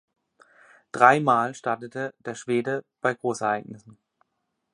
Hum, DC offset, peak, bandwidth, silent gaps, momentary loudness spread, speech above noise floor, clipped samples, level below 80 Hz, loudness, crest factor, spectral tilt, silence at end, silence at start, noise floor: none; under 0.1%; -2 dBFS; 11 kHz; none; 15 LU; 54 dB; under 0.1%; -74 dBFS; -24 LUFS; 24 dB; -5.5 dB/octave; 0.95 s; 0.95 s; -78 dBFS